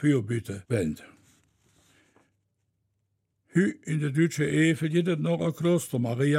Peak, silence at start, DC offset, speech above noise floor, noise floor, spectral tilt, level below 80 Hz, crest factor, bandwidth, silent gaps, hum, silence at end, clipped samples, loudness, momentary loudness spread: -10 dBFS; 0 s; under 0.1%; 51 dB; -77 dBFS; -6.5 dB/octave; -62 dBFS; 18 dB; 16 kHz; none; none; 0 s; under 0.1%; -27 LUFS; 7 LU